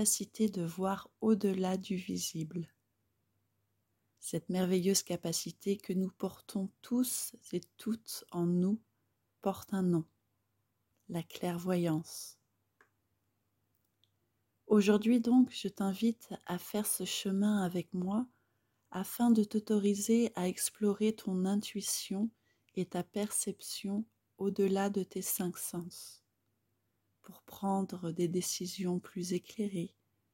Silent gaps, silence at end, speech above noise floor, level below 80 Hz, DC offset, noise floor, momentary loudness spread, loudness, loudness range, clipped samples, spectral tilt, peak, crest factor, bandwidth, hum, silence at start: none; 0.45 s; 47 dB; -76 dBFS; under 0.1%; -81 dBFS; 12 LU; -34 LUFS; 7 LU; under 0.1%; -5 dB/octave; -16 dBFS; 20 dB; 16.5 kHz; none; 0 s